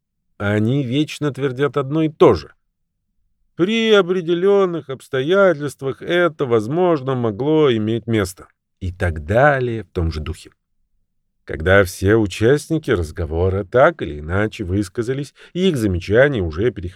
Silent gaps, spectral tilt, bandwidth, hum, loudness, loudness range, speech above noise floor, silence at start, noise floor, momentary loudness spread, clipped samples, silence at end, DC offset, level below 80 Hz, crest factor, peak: none; -6.5 dB/octave; 14.5 kHz; none; -18 LUFS; 3 LU; 53 dB; 0.4 s; -71 dBFS; 10 LU; under 0.1%; 0 s; under 0.1%; -38 dBFS; 18 dB; 0 dBFS